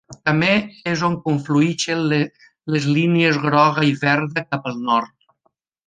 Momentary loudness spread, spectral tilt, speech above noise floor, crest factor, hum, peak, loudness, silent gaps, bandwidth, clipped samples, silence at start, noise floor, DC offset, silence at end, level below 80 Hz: 8 LU; -5.5 dB/octave; 49 dB; 18 dB; none; -2 dBFS; -19 LUFS; none; 9.6 kHz; under 0.1%; 0.1 s; -68 dBFS; under 0.1%; 0.8 s; -60 dBFS